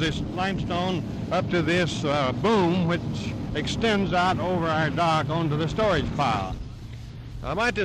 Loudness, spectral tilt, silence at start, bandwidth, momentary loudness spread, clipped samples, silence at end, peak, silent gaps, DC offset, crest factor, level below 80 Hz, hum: -25 LUFS; -6 dB/octave; 0 s; 12 kHz; 10 LU; under 0.1%; 0 s; -10 dBFS; none; under 0.1%; 14 dB; -42 dBFS; none